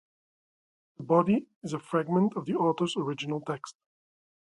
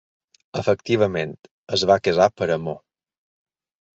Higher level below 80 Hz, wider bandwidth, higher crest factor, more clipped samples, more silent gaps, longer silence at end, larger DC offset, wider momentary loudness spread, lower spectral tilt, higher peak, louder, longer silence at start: second, -70 dBFS vs -54 dBFS; first, 11.5 kHz vs 8 kHz; about the same, 22 dB vs 20 dB; neither; second, 1.56-1.61 s vs 1.51-1.67 s; second, 0.9 s vs 1.15 s; neither; about the same, 13 LU vs 14 LU; first, -6.5 dB/octave vs -5 dB/octave; second, -8 dBFS vs -4 dBFS; second, -29 LUFS vs -21 LUFS; first, 1 s vs 0.55 s